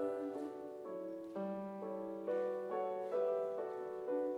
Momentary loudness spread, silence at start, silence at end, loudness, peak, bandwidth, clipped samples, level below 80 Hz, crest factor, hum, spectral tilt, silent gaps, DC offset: 8 LU; 0 s; 0 s; -42 LUFS; -26 dBFS; 11 kHz; under 0.1%; -86 dBFS; 14 dB; none; -8 dB/octave; none; under 0.1%